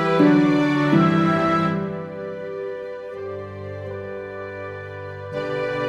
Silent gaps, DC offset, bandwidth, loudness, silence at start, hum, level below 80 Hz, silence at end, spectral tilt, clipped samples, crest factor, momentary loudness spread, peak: none; under 0.1%; 8.2 kHz; -22 LUFS; 0 s; none; -56 dBFS; 0 s; -8 dB/octave; under 0.1%; 18 dB; 16 LU; -4 dBFS